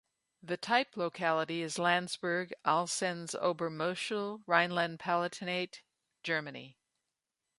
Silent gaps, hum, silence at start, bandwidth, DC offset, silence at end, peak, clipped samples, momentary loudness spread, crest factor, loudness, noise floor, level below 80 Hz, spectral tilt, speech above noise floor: none; none; 0.45 s; 11.5 kHz; under 0.1%; 0.85 s; -12 dBFS; under 0.1%; 7 LU; 24 dB; -33 LUFS; -88 dBFS; -82 dBFS; -3.5 dB/octave; 54 dB